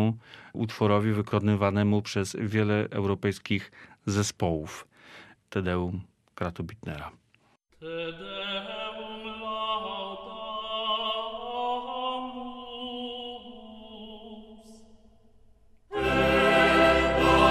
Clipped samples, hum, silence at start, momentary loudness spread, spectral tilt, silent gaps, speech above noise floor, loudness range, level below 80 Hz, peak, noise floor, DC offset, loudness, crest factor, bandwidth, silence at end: under 0.1%; none; 0 s; 21 LU; -5.5 dB/octave; none; 38 dB; 10 LU; -48 dBFS; -8 dBFS; -66 dBFS; under 0.1%; -28 LUFS; 20 dB; 14 kHz; 0 s